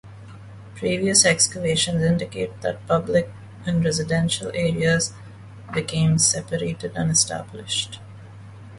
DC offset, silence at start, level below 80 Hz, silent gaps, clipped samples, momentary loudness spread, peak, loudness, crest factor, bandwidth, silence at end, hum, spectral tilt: under 0.1%; 0.05 s; -48 dBFS; none; under 0.1%; 19 LU; -2 dBFS; -21 LUFS; 20 dB; 11.5 kHz; 0 s; none; -3.5 dB/octave